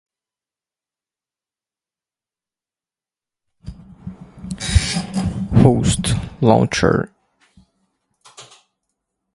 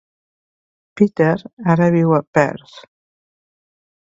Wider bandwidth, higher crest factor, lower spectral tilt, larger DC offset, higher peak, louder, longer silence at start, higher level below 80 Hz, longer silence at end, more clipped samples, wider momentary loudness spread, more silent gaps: first, 11.5 kHz vs 7.6 kHz; about the same, 22 dB vs 20 dB; second, -5.5 dB/octave vs -8.5 dB/octave; neither; about the same, 0 dBFS vs 0 dBFS; about the same, -17 LUFS vs -16 LUFS; first, 3.65 s vs 0.95 s; first, -32 dBFS vs -58 dBFS; second, 0.9 s vs 1.35 s; neither; first, 23 LU vs 7 LU; second, none vs 1.53-1.57 s, 2.27-2.33 s